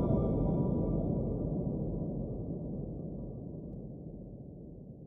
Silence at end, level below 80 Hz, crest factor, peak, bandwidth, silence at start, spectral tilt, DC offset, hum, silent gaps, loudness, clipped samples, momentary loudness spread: 0 s; -44 dBFS; 16 dB; -18 dBFS; 3.6 kHz; 0 s; -14 dB/octave; under 0.1%; none; none; -36 LUFS; under 0.1%; 16 LU